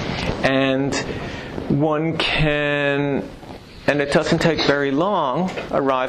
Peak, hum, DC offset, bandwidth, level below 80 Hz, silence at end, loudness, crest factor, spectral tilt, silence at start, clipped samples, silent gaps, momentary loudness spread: -6 dBFS; none; under 0.1%; 12.5 kHz; -38 dBFS; 0 s; -20 LUFS; 14 dB; -5.5 dB/octave; 0 s; under 0.1%; none; 11 LU